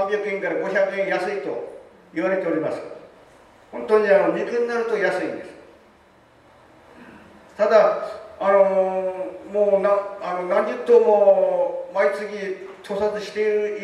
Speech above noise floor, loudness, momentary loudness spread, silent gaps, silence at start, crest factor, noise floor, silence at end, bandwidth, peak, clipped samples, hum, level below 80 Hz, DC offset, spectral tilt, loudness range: 33 dB; -21 LUFS; 15 LU; none; 0 s; 18 dB; -53 dBFS; 0 s; 11 kHz; -4 dBFS; under 0.1%; none; -66 dBFS; under 0.1%; -6 dB/octave; 6 LU